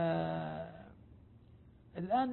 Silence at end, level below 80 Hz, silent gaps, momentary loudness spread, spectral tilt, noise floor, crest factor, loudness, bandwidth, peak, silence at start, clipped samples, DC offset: 0 s; -64 dBFS; none; 26 LU; -6 dB/octave; -60 dBFS; 16 dB; -38 LUFS; 4.2 kHz; -22 dBFS; 0 s; under 0.1%; under 0.1%